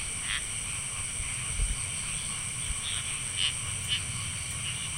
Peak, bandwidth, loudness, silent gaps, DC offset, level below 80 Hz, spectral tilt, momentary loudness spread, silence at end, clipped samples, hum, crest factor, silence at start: -14 dBFS; 16 kHz; -31 LUFS; none; under 0.1%; -42 dBFS; -0.5 dB/octave; 4 LU; 0 s; under 0.1%; none; 18 dB; 0 s